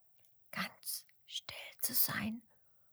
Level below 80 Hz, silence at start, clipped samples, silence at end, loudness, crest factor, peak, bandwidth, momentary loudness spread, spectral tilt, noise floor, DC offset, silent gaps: -76 dBFS; 0.55 s; under 0.1%; 0.55 s; -37 LUFS; 24 dB; -18 dBFS; over 20 kHz; 16 LU; -2 dB/octave; -67 dBFS; under 0.1%; none